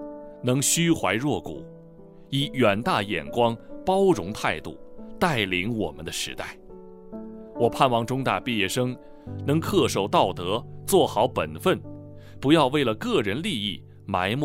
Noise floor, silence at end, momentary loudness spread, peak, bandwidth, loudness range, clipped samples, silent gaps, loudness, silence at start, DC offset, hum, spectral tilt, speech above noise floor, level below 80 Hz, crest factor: -47 dBFS; 0 s; 18 LU; -4 dBFS; 16 kHz; 3 LU; under 0.1%; none; -24 LUFS; 0 s; under 0.1%; none; -4.5 dB/octave; 23 dB; -52 dBFS; 22 dB